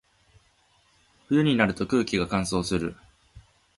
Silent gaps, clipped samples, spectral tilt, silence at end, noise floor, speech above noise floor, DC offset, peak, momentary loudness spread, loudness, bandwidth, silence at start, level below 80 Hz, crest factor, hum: none; under 0.1%; -5.5 dB/octave; 0.4 s; -64 dBFS; 40 dB; under 0.1%; -6 dBFS; 7 LU; -25 LUFS; 11.5 kHz; 1.3 s; -50 dBFS; 22 dB; none